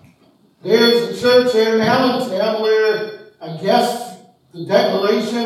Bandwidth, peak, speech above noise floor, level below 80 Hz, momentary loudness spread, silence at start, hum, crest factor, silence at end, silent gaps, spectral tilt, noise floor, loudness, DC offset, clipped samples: 14 kHz; 0 dBFS; 38 dB; -64 dBFS; 18 LU; 0.65 s; none; 16 dB; 0 s; none; -4.5 dB/octave; -54 dBFS; -16 LUFS; under 0.1%; under 0.1%